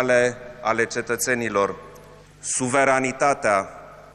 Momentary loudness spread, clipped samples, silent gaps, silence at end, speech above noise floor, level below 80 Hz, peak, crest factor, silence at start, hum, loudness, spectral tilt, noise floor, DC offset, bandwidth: 12 LU; under 0.1%; none; 0.05 s; 24 dB; -56 dBFS; -4 dBFS; 18 dB; 0 s; 50 Hz at -55 dBFS; -22 LUFS; -3.5 dB/octave; -46 dBFS; under 0.1%; 13.5 kHz